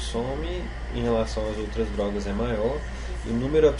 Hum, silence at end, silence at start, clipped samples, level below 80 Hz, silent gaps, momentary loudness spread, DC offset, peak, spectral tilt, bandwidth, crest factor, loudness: none; 0 s; 0 s; under 0.1%; -32 dBFS; none; 8 LU; under 0.1%; -8 dBFS; -6.5 dB/octave; 10.5 kHz; 18 dB; -28 LUFS